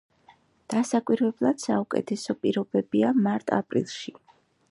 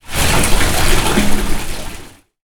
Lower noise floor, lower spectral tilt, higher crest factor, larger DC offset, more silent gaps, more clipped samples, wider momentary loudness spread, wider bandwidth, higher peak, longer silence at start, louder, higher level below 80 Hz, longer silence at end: first, -59 dBFS vs -34 dBFS; first, -6 dB/octave vs -3.5 dB/octave; first, 20 dB vs 12 dB; neither; neither; neither; second, 7 LU vs 14 LU; second, 11.5 kHz vs 19.5 kHz; second, -6 dBFS vs 0 dBFS; first, 0.7 s vs 0.1 s; second, -26 LUFS vs -16 LUFS; second, -70 dBFS vs -18 dBFS; first, 0.6 s vs 0.4 s